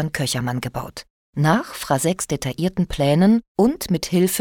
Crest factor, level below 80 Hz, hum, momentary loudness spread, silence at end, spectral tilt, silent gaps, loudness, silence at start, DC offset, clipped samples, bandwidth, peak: 16 dB; -44 dBFS; none; 12 LU; 0 s; -5.5 dB/octave; 1.10-1.33 s, 3.48-3.55 s; -20 LUFS; 0 s; under 0.1%; under 0.1%; 18.5 kHz; -4 dBFS